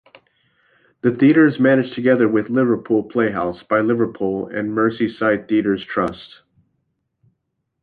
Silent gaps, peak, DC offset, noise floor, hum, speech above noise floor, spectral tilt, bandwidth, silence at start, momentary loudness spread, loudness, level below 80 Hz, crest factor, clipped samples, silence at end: none; -2 dBFS; under 0.1%; -73 dBFS; none; 56 dB; -9.5 dB/octave; 4.8 kHz; 1.05 s; 9 LU; -18 LUFS; -56 dBFS; 16 dB; under 0.1%; 1.55 s